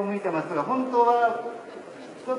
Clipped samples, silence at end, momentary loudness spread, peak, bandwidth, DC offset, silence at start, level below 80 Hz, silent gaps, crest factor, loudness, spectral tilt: under 0.1%; 0 s; 20 LU; -10 dBFS; 11 kHz; under 0.1%; 0 s; -80 dBFS; none; 16 dB; -24 LUFS; -6.5 dB/octave